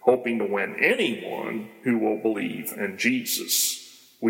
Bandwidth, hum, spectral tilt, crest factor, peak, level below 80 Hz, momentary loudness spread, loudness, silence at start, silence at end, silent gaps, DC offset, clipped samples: 17 kHz; none; -2.5 dB/octave; 20 dB; -6 dBFS; -76 dBFS; 10 LU; -25 LUFS; 0.05 s; 0 s; none; under 0.1%; under 0.1%